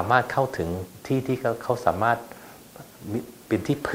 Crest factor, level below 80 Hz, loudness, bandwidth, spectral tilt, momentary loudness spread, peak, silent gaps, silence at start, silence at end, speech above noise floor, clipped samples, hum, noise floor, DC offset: 22 dB; -54 dBFS; -26 LUFS; 16 kHz; -6.5 dB/octave; 21 LU; -4 dBFS; none; 0 s; 0 s; 21 dB; under 0.1%; none; -46 dBFS; under 0.1%